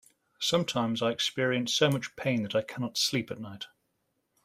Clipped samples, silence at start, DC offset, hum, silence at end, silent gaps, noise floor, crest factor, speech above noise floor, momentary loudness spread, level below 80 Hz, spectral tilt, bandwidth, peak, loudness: under 0.1%; 0.4 s; under 0.1%; none; 0.8 s; none; -78 dBFS; 20 dB; 48 dB; 14 LU; -70 dBFS; -4 dB/octave; 16 kHz; -10 dBFS; -29 LUFS